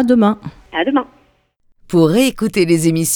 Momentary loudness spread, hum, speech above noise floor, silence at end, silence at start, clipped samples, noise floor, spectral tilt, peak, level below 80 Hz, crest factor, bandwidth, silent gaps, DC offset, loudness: 11 LU; none; 43 dB; 0 s; 0 s; under 0.1%; -57 dBFS; -5 dB/octave; 0 dBFS; -48 dBFS; 16 dB; 19.5 kHz; none; under 0.1%; -15 LUFS